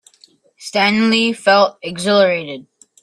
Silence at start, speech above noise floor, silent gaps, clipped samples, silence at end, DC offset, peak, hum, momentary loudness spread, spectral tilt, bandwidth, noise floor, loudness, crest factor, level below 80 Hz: 0.6 s; 37 dB; none; under 0.1%; 0.4 s; under 0.1%; 0 dBFS; none; 16 LU; -4 dB/octave; 12.5 kHz; -52 dBFS; -15 LUFS; 16 dB; -62 dBFS